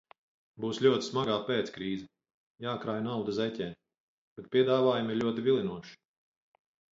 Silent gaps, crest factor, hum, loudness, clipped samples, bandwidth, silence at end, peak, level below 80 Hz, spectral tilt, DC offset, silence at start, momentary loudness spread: 2.34-2.55 s, 4.00-4.36 s; 20 dB; none; -31 LUFS; under 0.1%; 7.8 kHz; 0.95 s; -12 dBFS; -68 dBFS; -6 dB/octave; under 0.1%; 0.6 s; 13 LU